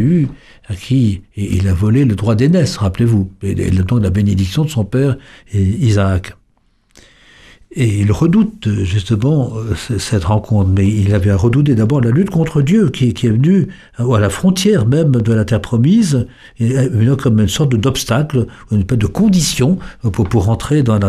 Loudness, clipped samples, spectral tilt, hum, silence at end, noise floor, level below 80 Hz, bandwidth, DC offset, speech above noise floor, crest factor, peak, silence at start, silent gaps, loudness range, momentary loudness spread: -14 LUFS; under 0.1%; -7 dB/octave; none; 0 s; -56 dBFS; -34 dBFS; 14 kHz; under 0.1%; 43 dB; 12 dB; -2 dBFS; 0 s; none; 4 LU; 7 LU